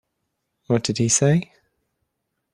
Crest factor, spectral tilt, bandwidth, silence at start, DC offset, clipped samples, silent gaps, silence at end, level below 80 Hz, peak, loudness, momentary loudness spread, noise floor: 18 dB; -4.5 dB/octave; 12 kHz; 0.7 s; under 0.1%; under 0.1%; none; 1.1 s; -56 dBFS; -6 dBFS; -20 LUFS; 6 LU; -77 dBFS